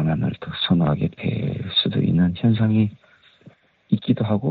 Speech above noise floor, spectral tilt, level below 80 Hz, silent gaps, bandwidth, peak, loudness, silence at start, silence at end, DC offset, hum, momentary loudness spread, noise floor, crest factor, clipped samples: 31 dB; -6 dB/octave; -48 dBFS; none; 4.8 kHz; -6 dBFS; -21 LUFS; 0 s; 0 s; under 0.1%; none; 7 LU; -51 dBFS; 16 dB; under 0.1%